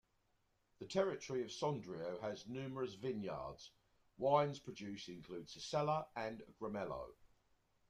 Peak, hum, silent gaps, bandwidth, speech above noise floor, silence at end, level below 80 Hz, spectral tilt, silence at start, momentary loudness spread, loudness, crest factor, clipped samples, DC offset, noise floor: -20 dBFS; none; none; 11 kHz; 38 dB; 0.65 s; -74 dBFS; -5.5 dB/octave; 0.8 s; 14 LU; -43 LUFS; 22 dB; under 0.1%; under 0.1%; -80 dBFS